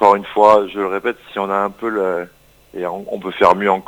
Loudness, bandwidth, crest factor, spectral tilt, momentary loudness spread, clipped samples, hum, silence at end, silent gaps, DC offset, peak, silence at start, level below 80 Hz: -17 LUFS; 19 kHz; 16 dB; -6 dB/octave; 14 LU; 0.2%; none; 0.05 s; none; under 0.1%; 0 dBFS; 0 s; -54 dBFS